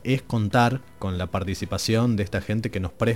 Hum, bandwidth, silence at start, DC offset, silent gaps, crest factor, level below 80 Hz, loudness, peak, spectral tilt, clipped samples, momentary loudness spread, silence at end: none; 16.5 kHz; 0.05 s; 0.4%; none; 18 dB; -46 dBFS; -25 LUFS; -6 dBFS; -6 dB/octave; under 0.1%; 9 LU; 0 s